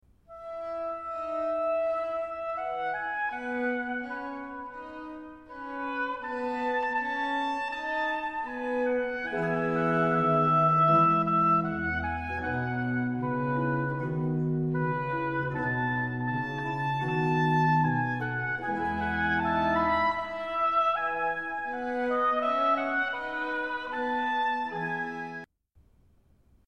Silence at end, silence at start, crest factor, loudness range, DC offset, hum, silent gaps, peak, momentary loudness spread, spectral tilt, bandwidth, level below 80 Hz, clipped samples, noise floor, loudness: 1.25 s; 0.3 s; 16 dB; 8 LU; 0.1%; none; none; -12 dBFS; 11 LU; -8 dB/octave; 8.4 kHz; -56 dBFS; under 0.1%; -63 dBFS; -28 LUFS